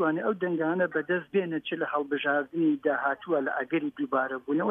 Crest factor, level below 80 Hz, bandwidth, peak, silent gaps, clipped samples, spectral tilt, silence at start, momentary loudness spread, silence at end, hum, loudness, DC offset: 14 dB; -76 dBFS; 3.8 kHz; -14 dBFS; none; under 0.1%; -8.5 dB/octave; 0 s; 4 LU; 0 s; none; -28 LUFS; under 0.1%